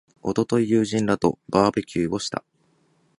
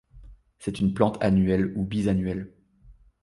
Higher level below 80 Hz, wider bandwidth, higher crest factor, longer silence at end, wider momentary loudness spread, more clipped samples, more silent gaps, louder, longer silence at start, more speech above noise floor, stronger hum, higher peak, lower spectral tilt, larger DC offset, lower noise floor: second, -54 dBFS vs -46 dBFS; about the same, 11.5 kHz vs 11.5 kHz; about the same, 22 dB vs 20 dB; first, 0.8 s vs 0.3 s; second, 7 LU vs 13 LU; neither; neither; about the same, -23 LUFS vs -25 LUFS; about the same, 0.25 s vs 0.15 s; first, 42 dB vs 30 dB; neither; first, -2 dBFS vs -6 dBFS; second, -6 dB/octave vs -8 dB/octave; neither; first, -64 dBFS vs -54 dBFS